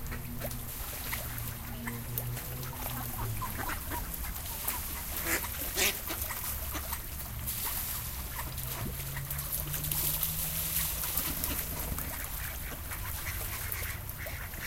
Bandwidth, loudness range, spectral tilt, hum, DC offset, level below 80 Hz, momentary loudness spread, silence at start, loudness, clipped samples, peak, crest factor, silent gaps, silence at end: 17 kHz; 5 LU; -2.5 dB/octave; none; under 0.1%; -42 dBFS; 8 LU; 0 s; -34 LUFS; under 0.1%; -10 dBFS; 24 dB; none; 0 s